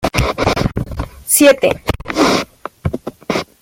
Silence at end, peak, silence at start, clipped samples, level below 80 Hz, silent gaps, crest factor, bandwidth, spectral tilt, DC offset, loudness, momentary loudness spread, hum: 0.2 s; 0 dBFS; 0 s; under 0.1%; -30 dBFS; none; 16 dB; 17 kHz; -4 dB/octave; under 0.1%; -15 LUFS; 16 LU; none